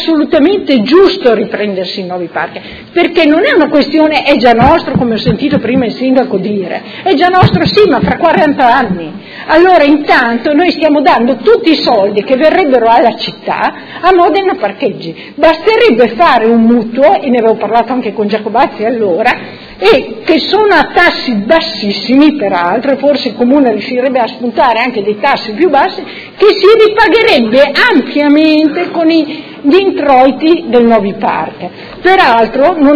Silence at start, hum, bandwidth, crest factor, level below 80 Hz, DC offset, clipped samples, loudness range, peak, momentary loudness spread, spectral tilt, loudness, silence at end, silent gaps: 0 s; none; 5.4 kHz; 8 dB; -38 dBFS; under 0.1%; 2%; 3 LU; 0 dBFS; 9 LU; -7 dB/octave; -9 LUFS; 0 s; none